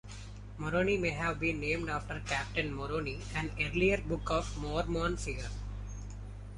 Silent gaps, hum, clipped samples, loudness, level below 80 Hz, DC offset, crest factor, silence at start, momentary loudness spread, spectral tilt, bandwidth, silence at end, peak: none; 50 Hz at -40 dBFS; under 0.1%; -34 LUFS; -44 dBFS; under 0.1%; 20 dB; 0.05 s; 15 LU; -5.5 dB/octave; 11.5 kHz; 0 s; -14 dBFS